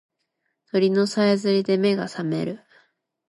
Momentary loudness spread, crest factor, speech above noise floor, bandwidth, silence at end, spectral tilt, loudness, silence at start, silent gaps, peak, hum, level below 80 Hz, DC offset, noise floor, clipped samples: 8 LU; 14 dB; 55 dB; 11.5 kHz; 0.75 s; -6 dB/octave; -22 LUFS; 0.75 s; none; -10 dBFS; none; -70 dBFS; under 0.1%; -76 dBFS; under 0.1%